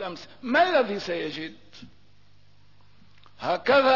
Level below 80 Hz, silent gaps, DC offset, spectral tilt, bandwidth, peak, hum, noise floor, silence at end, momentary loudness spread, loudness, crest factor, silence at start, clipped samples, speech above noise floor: -64 dBFS; none; 0.3%; -5 dB/octave; 6 kHz; -10 dBFS; 50 Hz at -60 dBFS; -60 dBFS; 0 s; 17 LU; -25 LUFS; 16 dB; 0 s; under 0.1%; 35 dB